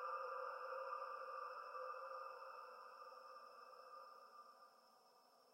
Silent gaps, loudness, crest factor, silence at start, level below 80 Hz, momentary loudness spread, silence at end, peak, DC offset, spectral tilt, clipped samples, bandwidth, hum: none; -52 LUFS; 16 dB; 0 s; under -90 dBFS; 14 LU; 0 s; -38 dBFS; under 0.1%; -1 dB/octave; under 0.1%; 16 kHz; none